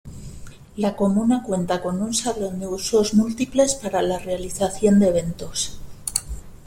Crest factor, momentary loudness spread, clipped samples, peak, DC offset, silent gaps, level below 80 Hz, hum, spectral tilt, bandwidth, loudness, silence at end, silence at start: 22 dB; 11 LU; under 0.1%; 0 dBFS; under 0.1%; none; -42 dBFS; none; -5 dB/octave; 16.5 kHz; -22 LUFS; 0 s; 0.05 s